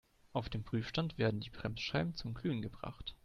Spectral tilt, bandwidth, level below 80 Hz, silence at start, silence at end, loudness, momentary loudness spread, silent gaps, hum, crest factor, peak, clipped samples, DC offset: -6.5 dB/octave; 10.5 kHz; -56 dBFS; 0.35 s; 0.1 s; -39 LUFS; 8 LU; none; none; 20 dB; -18 dBFS; under 0.1%; under 0.1%